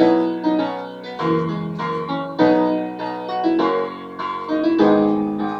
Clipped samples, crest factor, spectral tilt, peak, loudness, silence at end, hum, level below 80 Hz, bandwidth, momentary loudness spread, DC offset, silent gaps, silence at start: under 0.1%; 16 dB; -8 dB/octave; -2 dBFS; -20 LUFS; 0 s; none; -58 dBFS; 6.4 kHz; 11 LU; under 0.1%; none; 0 s